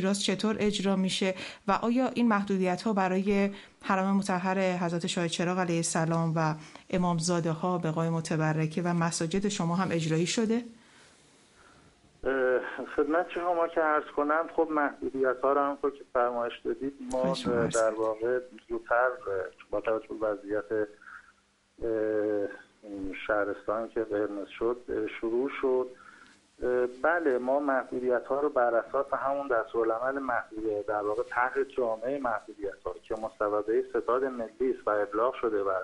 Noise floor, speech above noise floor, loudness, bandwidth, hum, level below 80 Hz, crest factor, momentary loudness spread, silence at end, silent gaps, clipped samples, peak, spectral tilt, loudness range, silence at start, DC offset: -65 dBFS; 36 dB; -29 LUFS; 11.5 kHz; none; -60 dBFS; 18 dB; 7 LU; 0 s; none; under 0.1%; -12 dBFS; -5.5 dB/octave; 4 LU; 0 s; under 0.1%